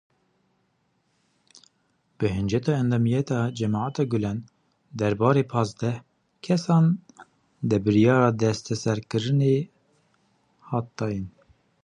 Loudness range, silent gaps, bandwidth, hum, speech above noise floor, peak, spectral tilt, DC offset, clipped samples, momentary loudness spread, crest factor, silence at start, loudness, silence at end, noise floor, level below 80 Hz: 4 LU; none; 10 kHz; none; 47 dB; -4 dBFS; -7 dB/octave; under 0.1%; under 0.1%; 11 LU; 20 dB; 2.2 s; -24 LUFS; 0.55 s; -70 dBFS; -54 dBFS